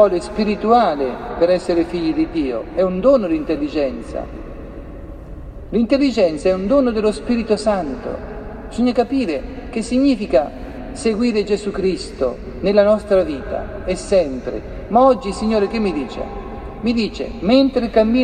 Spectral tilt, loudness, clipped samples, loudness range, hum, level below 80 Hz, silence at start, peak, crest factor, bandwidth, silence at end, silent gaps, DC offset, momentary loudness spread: -6 dB/octave; -18 LUFS; under 0.1%; 3 LU; none; -36 dBFS; 0 s; 0 dBFS; 18 dB; 9.8 kHz; 0 s; none; under 0.1%; 15 LU